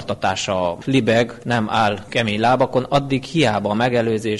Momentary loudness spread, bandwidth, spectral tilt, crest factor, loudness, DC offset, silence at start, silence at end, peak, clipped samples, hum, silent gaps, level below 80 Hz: 5 LU; 11.5 kHz; -5.5 dB/octave; 14 dB; -19 LUFS; under 0.1%; 0 s; 0 s; -6 dBFS; under 0.1%; none; none; -50 dBFS